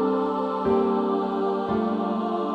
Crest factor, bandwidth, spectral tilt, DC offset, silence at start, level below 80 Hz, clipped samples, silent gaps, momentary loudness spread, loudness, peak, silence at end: 14 dB; 6 kHz; -8.5 dB/octave; under 0.1%; 0 s; -56 dBFS; under 0.1%; none; 4 LU; -25 LUFS; -10 dBFS; 0 s